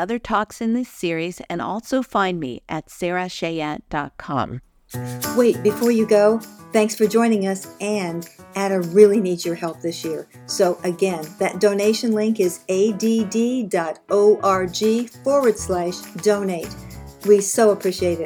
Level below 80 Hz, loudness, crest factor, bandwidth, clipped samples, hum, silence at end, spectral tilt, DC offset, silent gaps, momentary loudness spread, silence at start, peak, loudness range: -52 dBFS; -20 LUFS; 20 dB; over 20 kHz; under 0.1%; none; 0 s; -5 dB/octave; under 0.1%; none; 12 LU; 0 s; 0 dBFS; 5 LU